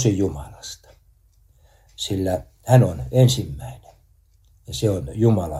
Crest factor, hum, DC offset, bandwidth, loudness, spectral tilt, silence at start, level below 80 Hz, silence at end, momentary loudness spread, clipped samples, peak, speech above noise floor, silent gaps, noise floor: 20 dB; none; under 0.1%; 13.5 kHz; -21 LUFS; -6.5 dB/octave; 0 s; -44 dBFS; 0 s; 19 LU; under 0.1%; -2 dBFS; 37 dB; none; -56 dBFS